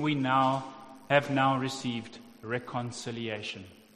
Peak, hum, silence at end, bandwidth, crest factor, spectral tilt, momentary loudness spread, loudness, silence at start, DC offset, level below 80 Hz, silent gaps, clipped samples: -8 dBFS; none; 0.2 s; 13.5 kHz; 24 dB; -5.5 dB/octave; 19 LU; -30 LUFS; 0 s; under 0.1%; -68 dBFS; none; under 0.1%